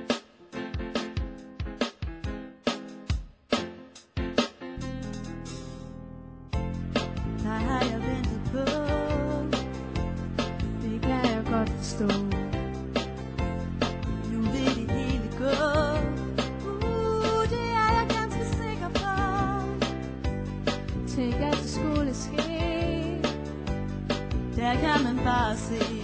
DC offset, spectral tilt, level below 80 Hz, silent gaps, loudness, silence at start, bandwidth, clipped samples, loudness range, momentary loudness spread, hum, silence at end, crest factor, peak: under 0.1%; -6 dB/octave; -38 dBFS; none; -29 LUFS; 0 s; 8 kHz; under 0.1%; 7 LU; 11 LU; none; 0 s; 18 dB; -12 dBFS